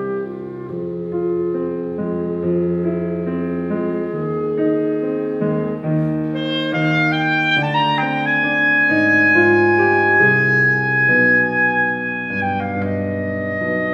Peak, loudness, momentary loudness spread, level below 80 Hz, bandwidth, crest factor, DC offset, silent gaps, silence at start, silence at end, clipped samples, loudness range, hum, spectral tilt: -4 dBFS; -17 LUFS; 10 LU; -58 dBFS; 7 kHz; 14 dB; under 0.1%; none; 0 s; 0 s; under 0.1%; 8 LU; none; -7.5 dB/octave